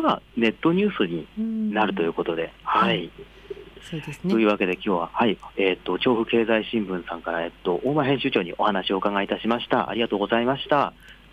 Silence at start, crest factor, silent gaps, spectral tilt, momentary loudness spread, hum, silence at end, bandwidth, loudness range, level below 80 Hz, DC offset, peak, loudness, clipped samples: 0 s; 16 dB; none; -7 dB/octave; 8 LU; none; 0.2 s; 11.5 kHz; 2 LU; -54 dBFS; under 0.1%; -8 dBFS; -24 LUFS; under 0.1%